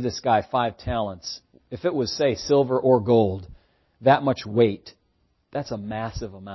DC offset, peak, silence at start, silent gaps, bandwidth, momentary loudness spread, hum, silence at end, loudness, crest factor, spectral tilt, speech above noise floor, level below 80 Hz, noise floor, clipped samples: under 0.1%; -6 dBFS; 0 s; none; 6.2 kHz; 15 LU; none; 0 s; -23 LUFS; 18 dB; -6 dB/octave; 45 dB; -48 dBFS; -68 dBFS; under 0.1%